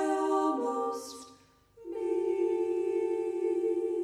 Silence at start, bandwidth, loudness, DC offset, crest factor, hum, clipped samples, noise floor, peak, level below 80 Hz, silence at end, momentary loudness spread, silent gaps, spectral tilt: 0 s; 13 kHz; -31 LUFS; under 0.1%; 14 dB; none; under 0.1%; -59 dBFS; -18 dBFS; -74 dBFS; 0 s; 13 LU; none; -4.5 dB/octave